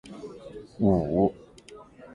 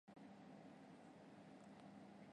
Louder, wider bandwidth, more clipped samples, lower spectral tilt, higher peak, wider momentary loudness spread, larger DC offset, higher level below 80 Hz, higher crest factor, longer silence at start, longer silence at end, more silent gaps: first, -25 LUFS vs -62 LUFS; about the same, 10.5 kHz vs 10.5 kHz; neither; first, -9.5 dB/octave vs -6.5 dB/octave; first, -8 dBFS vs -48 dBFS; first, 25 LU vs 1 LU; neither; first, -48 dBFS vs under -90 dBFS; first, 20 dB vs 14 dB; about the same, 0.05 s vs 0.05 s; about the same, 0 s vs 0 s; neither